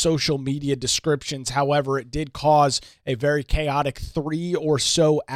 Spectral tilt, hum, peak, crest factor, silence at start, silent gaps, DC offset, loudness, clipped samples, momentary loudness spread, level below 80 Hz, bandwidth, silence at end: -4.5 dB/octave; none; -6 dBFS; 16 dB; 0 s; none; under 0.1%; -22 LUFS; under 0.1%; 8 LU; -36 dBFS; 15 kHz; 0 s